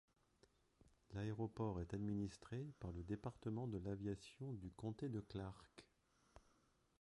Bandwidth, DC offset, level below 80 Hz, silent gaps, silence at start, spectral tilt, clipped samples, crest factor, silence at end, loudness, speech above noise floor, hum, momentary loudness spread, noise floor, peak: 11 kHz; under 0.1%; -66 dBFS; none; 1.1 s; -8 dB/octave; under 0.1%; 16 dB; 0.6 s; -49 LUFS; 31 dB; none; 7 LU; -79 dBFS; -34 dBFS